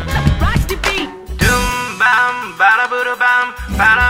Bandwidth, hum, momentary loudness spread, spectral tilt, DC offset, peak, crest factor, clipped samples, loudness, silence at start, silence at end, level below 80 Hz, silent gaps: 16.5 kHz; none; 6 LU; -4 dB/octave; under 0.1%; 0 dBFS; 14 dB; under 0.1%; -14 LUFS; 0 s; 0 s; -24 dBFS; none